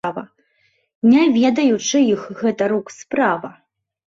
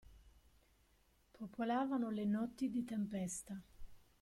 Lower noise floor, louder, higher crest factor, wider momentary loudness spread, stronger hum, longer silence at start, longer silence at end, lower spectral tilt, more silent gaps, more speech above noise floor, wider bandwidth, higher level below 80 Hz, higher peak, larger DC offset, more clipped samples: second, -63 dBFS vs -74 dBFS; first, -17 LUFS vs -41 LUFS; about the same, 14 dB vs 16 dB; about the same, 13 LU vs 14 LU; neither; about the same, 0.05 s vs 0.05 s; first, 0.55 s vs 0.25 s; about the same, -4.5 dB/octave vs -5.5 dB/octave; first, 0.95-1.02 s vs none; first, 46 dB vs 33 dB; second, 7.6 kHz vs 14.5 kHz; about the same, -62 dBFS vs -66 dBFS; first, -4 dBFS vs -26 dBFS; neither; neither